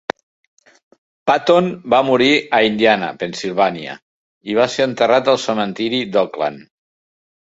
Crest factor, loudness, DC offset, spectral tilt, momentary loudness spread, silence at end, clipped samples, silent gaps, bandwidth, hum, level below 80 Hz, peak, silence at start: 16 dB; -16 LUFS; under 0.1%; -4.5 dB/octave; 12 LU; 0.85 s; under 0.1%; 4.02-4.41 s; 8 kHz; none; -60 dBFS; -2 dBFS; 1.25 s